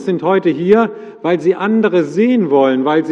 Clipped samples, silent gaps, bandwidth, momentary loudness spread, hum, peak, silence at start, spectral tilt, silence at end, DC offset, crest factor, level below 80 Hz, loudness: under 0.1%; none; 8.2 kHz; 4 LU; none; 0 dBFS; 0 s; -7.5 dB/octave; 0 s; under 0.1%; 12 dB; -60 dBFS; -14 LUFS